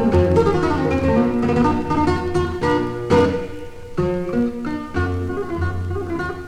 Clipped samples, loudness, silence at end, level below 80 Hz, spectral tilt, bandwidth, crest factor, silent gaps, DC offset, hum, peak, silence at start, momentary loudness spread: under 0.1%; -20 LUFS; 0 s; -34 dBFS; -7.5 dB/octave; 11 kHz; 16 dB; none; under 0.1%; none; -4 dBFS; 0 s; 9 LU